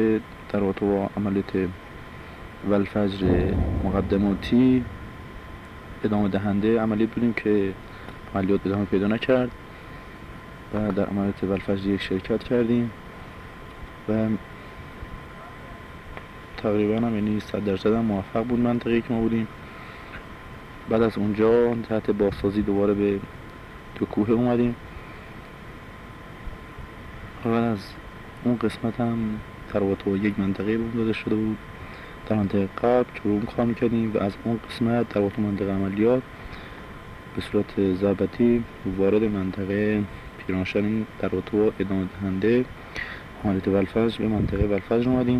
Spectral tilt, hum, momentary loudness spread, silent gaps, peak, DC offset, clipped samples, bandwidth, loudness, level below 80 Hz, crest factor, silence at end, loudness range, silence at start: -8.5 dB/octave; none; 19 LU; none; -8 dBFS; under 0.1%; under 0.1%; 12 kHz; -24 LUFS; -42 dBFS; 16 dB; 0 s; 5 LU; 0 s